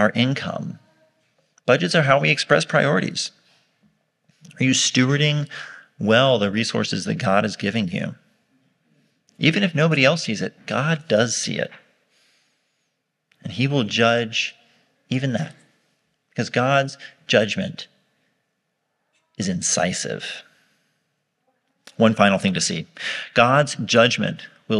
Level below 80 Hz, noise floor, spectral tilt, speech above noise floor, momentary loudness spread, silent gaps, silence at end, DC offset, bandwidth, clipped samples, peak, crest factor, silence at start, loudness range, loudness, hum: -68 dBFS; -74 dBFS; -4 dB/octave; 54 dB; 14 LU; none; 0 s; under 0.1%; 11.5 kHz; under 0.1%; 0 dBFS; 22 dB; 0 s; 5 LU; -20 LUFS; none